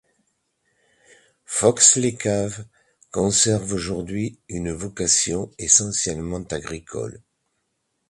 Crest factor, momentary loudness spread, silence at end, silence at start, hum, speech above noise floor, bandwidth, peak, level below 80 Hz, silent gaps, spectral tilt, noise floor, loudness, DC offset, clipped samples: 24 dB; 17 LU; 0.9 s; 1.5 s; none; 52 dB; 11.5 kHz; 0 dBFS; -48 dBFS; none; -3 dB/octave; -74 dBFS; -20 LUFS; under 0.1%; under 0.1%